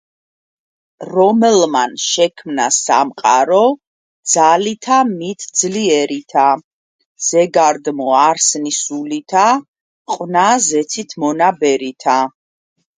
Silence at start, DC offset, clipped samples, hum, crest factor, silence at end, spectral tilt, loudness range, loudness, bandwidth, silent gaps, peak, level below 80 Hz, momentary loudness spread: 1 s; under 0.1%; under 0.1%; none; 16 dB; 0.7 s; -2.5 dB/octave; 2 LU; -14 LUFS; 10 kHz; 3.87-4.23 s, 6.64-6.99 s, 7.05-7.15 s, 9.68-9.74 s, 9.81-10.05 s; 0 dBFS; -66 dBFS; 9 LU